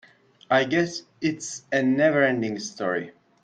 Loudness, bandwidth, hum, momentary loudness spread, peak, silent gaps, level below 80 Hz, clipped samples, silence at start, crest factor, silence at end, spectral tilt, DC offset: -24 LUFS; 9.4 kHz; none; 10 LU; -8 dBFS; none; -66 dBFS; under 0.1%; 0.5 s; 16 dB; 0.35 s; -4.5 dB/octave; under 0.1%